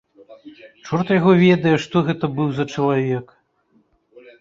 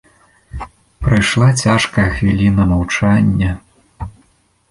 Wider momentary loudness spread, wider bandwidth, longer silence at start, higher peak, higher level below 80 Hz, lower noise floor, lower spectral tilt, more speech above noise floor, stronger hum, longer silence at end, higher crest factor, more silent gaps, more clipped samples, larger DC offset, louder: second, 11 LU vs 19 LU; second, 7.6 kHz vs 11.5 kHz; second, 0.3 s vs 0.55 s; about the same, -2 dBFS vs -2 dBFS; second, -58 dBFS vs -30 dBFS; first, -61 dBFS vs -56 dBFS; first, -7.5 dB/octave vs -5.5 dB/octave; about the same, 43 dB vs 43 dB; neither; first, 1.2 s vs 0.6 s; about the same, 18 dB vs 14 dB; neither; neither; neither; second, -18 LUFS vs -14 LUFS